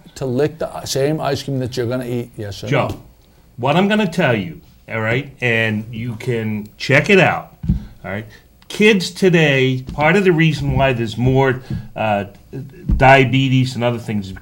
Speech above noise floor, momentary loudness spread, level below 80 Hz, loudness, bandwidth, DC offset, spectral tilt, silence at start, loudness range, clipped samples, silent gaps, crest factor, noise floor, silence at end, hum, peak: 31 dB; 15 LU; -34 dBFS; -17 LUFS; 16.5 kHz; under 0.1%; -6 dB/octave; 0.15 s; 5 LU; under 0.1%; none; 18 dB; -48 dBFS; 0 s; none; 0 dBFS